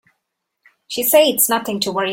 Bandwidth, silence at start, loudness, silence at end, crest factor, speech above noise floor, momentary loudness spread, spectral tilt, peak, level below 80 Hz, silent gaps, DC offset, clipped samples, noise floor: 17 kHz; 0.9 s; -15 LUFS; 0 s; 18 dB; 59 dB; 8 LU; -2 dB/octave; 0 dBFS; -62 dBFS; none; under 0.1%; under 0.1%; -76 dBFS